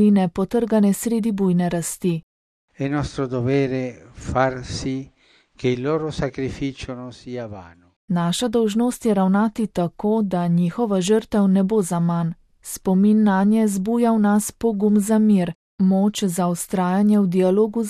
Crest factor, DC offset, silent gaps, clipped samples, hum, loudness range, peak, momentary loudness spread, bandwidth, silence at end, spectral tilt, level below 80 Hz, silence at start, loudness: 16 dB; under 0.1%; 2.23-2.68 s, 7.96-8.08 s, 15.55-15.78 s; under 0.1%; none; 7 LU; -4 dBFS; 11 LU; 14.5 kHz; 0 s; -6.5 dB/octave; -48 dBFS; 0 s; -20 LUFS